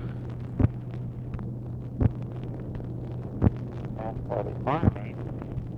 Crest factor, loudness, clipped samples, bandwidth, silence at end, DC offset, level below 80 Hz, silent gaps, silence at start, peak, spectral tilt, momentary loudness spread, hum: 22 dB; -31 LUFS; under 0.1%; 4.5 kHz; 0 s; under 0.1%; -40 dBFS; none; 0 s; -6 dBFS; -10.5 dB/octave; 9 LU; none